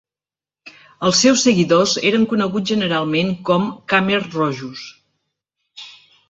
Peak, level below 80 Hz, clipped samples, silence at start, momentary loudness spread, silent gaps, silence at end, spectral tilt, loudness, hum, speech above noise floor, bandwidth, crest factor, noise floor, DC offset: -2 dBFS; -58 dBFS; under 0.1%; 0.65 s; 20 LU; none; 0.4 s; -4 dB/octave; -17 LUFS; none; over 73 dB; 8.2 kHz; 18 dB; under -90 dBFS; under 0.1%